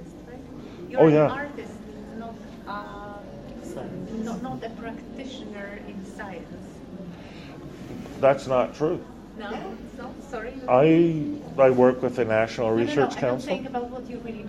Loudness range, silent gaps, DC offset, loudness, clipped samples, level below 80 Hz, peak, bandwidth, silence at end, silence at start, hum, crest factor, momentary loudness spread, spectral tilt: 14 LU; none; under 0.1%; -24 LUFS; under 0.1%; -52 dBFS; -4 dBFS; 12.5 kHz; 0 s; 0 s; none; 22 dB; 22 LU; -7 dB/octave